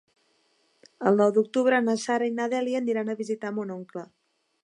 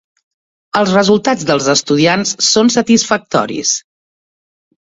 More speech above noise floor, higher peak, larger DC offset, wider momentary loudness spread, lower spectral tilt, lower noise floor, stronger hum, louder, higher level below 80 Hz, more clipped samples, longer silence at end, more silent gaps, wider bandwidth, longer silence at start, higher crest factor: second, 43 dB vs over 78 dB; second, -8 dBFS vs 0 dBFS; neither; first, 13 LU vs 6 LU; first, -5.5 dB/octave vs -3.5 dB/octave; second, -68 dBFS vs under -90 dBFS; neither; second, -25 LUFS vs -12 LUFS; second, -82 dBFS vs -52 dBFS; neither; second, 0.6 s vs 1.05 s; neither; first, 11 kHz vs 7.8 kHz; first, 1 s vs 0.75 s; first, 20 dB vs 14 dB